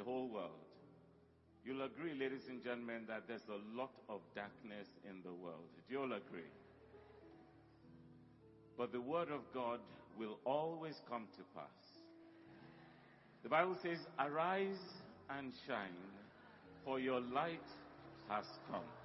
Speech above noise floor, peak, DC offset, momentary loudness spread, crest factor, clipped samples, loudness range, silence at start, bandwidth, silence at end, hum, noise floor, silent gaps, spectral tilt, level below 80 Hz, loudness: 24 dB; -22 dBFS; under 0.1%; 23 LU; 26 dB; under 0.1%; 8 LU; 0 s; 5.8 kHz; 0 s; none; -70 dBFS; none; -3.5 dB/octave; -84 dBFS; -46 LUFS